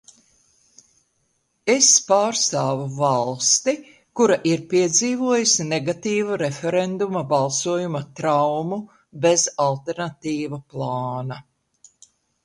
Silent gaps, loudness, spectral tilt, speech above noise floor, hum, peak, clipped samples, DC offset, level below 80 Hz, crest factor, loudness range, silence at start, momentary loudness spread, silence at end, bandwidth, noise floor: none; -20 LUFS; -3 dB/octave; 48 dB; none; -2 dBFS; under 0.1%; under 0.1%; -66 dBFS; 20 dB; 5 LU; 1.65 s; 11 LU; 1.05 s; 11.5 kHz; -69 dBFS